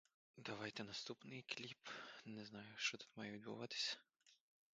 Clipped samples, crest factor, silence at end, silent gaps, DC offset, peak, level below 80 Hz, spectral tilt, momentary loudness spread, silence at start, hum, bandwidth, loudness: under 0.1%; 22 dB; 0.4 s; none; under 0.1%; -30 dBFS; -88 dBFS; -2.5 dB/octave; 10 LU; 0.35 s; none; 9 kHz; -49 LUFS